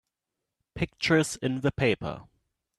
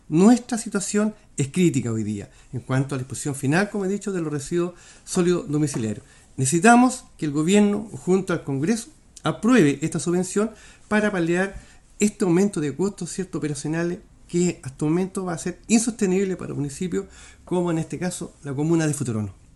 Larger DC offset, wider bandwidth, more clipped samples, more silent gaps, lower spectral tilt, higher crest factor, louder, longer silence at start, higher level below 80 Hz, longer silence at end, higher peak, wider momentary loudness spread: neither; about the same, 13 kHz vs 12.5 kHz; neither; neither; about the same, -5 dB/octave vs -5.5 dB/octave; about the same, 20 dB vs 22 dB; second, -27 LUFS vs -23 LUFS; first, 0.75 s vs 0.1 s; about the same, -52 dBFS vs -52 dBFS; first, 0.55 s vs 0.2 s; second, -10 dBFS vs 0 dBFS; first, 15 LU vs 11 LU